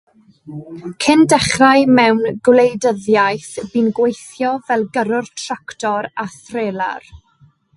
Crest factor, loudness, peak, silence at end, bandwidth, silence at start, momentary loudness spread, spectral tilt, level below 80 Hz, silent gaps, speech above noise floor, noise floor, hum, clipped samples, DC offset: 16 dB; -15 LUFS; 0 dBFS; 0.6 s; 11.5 kHz; 0.45 s; 15 LU; -4.5 dB/octave; -50 dBFS; none; 37 dB; -52 dBFS; none; under 0.1%; under 0.1%